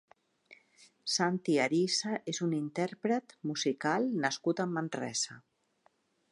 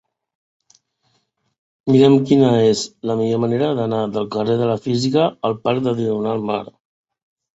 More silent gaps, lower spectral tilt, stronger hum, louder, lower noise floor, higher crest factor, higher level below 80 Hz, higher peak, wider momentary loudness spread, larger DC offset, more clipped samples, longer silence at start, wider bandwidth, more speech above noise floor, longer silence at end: neither; second, -4 dB/octave vs -6.5 dB/octave; neither; second, -32 LUFS vs -18 LUFS; first, -72 dBFS vs -67 dBFS; about the same, 20 dB vs 18 dB; second, -84 dBFS vs -58 dBFS; second, -14 dBFS vs -2 dBFS; about the same, 7 LU vs 9 LU; neither; neither; second, 0.5 s vs 1.85 s; first, 11.5 kHz vs 8 kHz; second, 40 dB vs 50 dB; about the same, 0.95 s vs 0.95 s